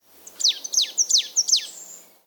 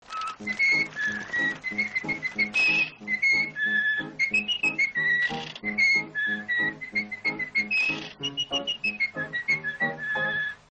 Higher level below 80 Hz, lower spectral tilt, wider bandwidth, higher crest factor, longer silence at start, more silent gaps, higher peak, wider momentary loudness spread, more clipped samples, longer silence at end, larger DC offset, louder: second, under -90 dBFS vs -64 dBFS; second, 5 dB/octave vs -2.5 dB/octave; first, 19 kHz vs 9 kHz; about the same, 18 dB vs 14 dB; first, 0.4 s vs 0.1 s; neither; first, -6 dBFS vs -14 dBFS; about the same, 9 LU vs 8 LU; neither; first, 0.3 s vs 0.15 s; neither; first, -19 LUFS vs -25 LUFS